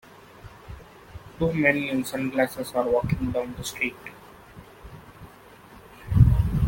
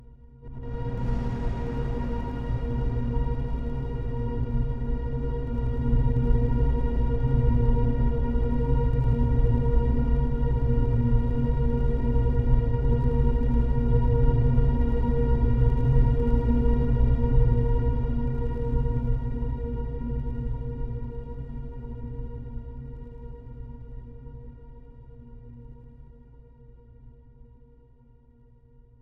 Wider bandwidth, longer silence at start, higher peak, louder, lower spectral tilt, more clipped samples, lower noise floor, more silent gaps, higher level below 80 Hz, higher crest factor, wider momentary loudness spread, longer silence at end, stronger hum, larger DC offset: first, 17 kHz vs 4 kHz; first, 0.45 s vs 0 s; first, -4 dBFS vs -8 dBFS; first, -24 LUFS vs -27 LUFS; second, -6.5 dB/octave vs -11 dB/octave; neither; second, -49 dBFS vs -55 dBFS; neither; second, -36 dBFS vs -26 dBFS; first, 22 dB vs 16 dB; first, 26 LU vs 17 LU; second, 0 s vs 1.5 s; neither; neither